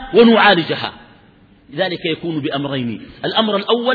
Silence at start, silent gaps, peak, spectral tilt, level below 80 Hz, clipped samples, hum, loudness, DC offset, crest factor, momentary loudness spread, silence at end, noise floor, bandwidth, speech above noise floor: 0 s; none; 0 dBFS; -8 dB/octave; -50 dBFS; under 0.1%; none; -16 LUFS; under 0.1%; 16 dB; 15 LU; 0 s; -48 dBFS; 4.9 kHz; 33 dB